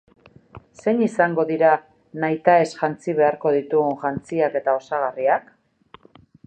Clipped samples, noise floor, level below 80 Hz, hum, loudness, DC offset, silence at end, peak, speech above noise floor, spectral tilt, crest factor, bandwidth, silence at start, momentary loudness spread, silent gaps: under 0.1%; -51 dBFS; -62 dBFS; none; -21 LUFS; under 0.1%; 1.05 s; -2 dBFS; 32 dB; -7 dB/octave; 20 dB; 9 kHz; 0.55 s; 8 LU; none